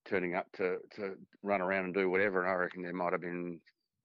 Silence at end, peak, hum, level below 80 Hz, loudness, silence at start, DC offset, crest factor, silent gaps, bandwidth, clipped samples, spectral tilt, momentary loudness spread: 0.45 s; -18 dBFS; none; -78 dBFS; -35 LUFS; 0.05 s; under 0.1%; 16 dB; none; 5.8 kHz; under 0.1%; -5 dB/octave; 12 LU